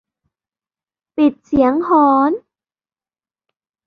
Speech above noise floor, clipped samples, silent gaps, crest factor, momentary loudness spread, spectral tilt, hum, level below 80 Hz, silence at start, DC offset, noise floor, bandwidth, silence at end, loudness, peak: over 76 dB; under 0.1%; none; 16 dB; 10 LU; -8 dB/octave; none; -50 dBFS; 1.15 s; under 0.1%; under -90 dBFS; 5 kHz; 1.5 s; -15 LUFS; -2 dBFS